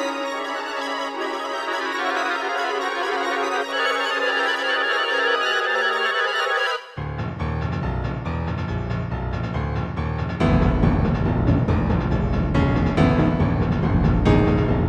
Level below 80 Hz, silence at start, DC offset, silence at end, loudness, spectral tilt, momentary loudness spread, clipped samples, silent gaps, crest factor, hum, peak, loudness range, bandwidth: -30 dBFS; 0 s; under 0.1%; 0 s; -22 LUFS; -6.5 dB/octave; 8 LU; under 0.1%; none; 16 dB; none; -4 dBFS; 5 LU; 12 kHz